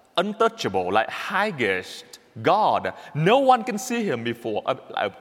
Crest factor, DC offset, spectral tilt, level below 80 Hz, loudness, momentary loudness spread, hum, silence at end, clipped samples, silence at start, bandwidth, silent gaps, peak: 20 dB; under 0.1%; -5 dB/octave; -72 dBFS; -23 LUFS; 9 LU; none; 0 s; under 0.1%; 0.15 s; 17 kHz; none; -4 dBFS